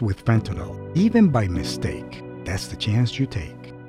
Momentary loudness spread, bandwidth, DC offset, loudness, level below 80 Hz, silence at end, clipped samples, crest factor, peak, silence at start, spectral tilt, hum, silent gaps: 16 LU; 13.5 kHz; under 0.1%; -23 LUFS; -42 dBFS; 0 s; under 0.1%; 16 dB; -6 dBFS; 0 s; -6.5 dB/octave; none; none